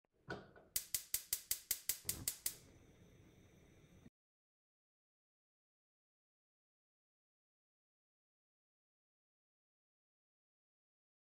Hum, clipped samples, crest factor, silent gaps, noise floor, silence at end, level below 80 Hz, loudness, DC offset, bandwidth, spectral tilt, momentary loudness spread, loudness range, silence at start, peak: none; under 0.1%; 32 dB; none; -66 dBFS; 7.25 s; -74 dBFS; -42 LUFS; under 0.1%; 16 kHz; -0.5 dB/octave; 13 LU; 8 LU; 0.3 s; -20 dBFS